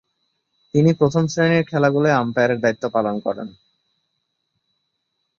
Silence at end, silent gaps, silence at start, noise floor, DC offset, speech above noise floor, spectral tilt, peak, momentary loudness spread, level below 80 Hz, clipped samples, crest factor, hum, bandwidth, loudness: 1.9 s; none; 0.75 s; -74 dBFS; under 0.1%; 56 dB; -7 dB/octave; -4 dBFS; 9 LU; -60 dBFS; under 0.1%; 18 dB; none; 7.4 kHz; -19 LUFS